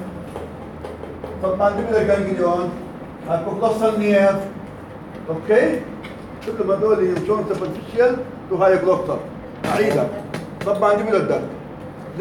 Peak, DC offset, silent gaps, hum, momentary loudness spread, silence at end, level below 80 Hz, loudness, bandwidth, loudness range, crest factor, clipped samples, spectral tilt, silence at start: -4 dBFS; under 0.1%; none; none; 17 LU; 0 s; -48 dBFS; -20 LUFS; 17 kHz; 2 LU; 16 dB; under 0.1%; -7 dB/octave; 0 s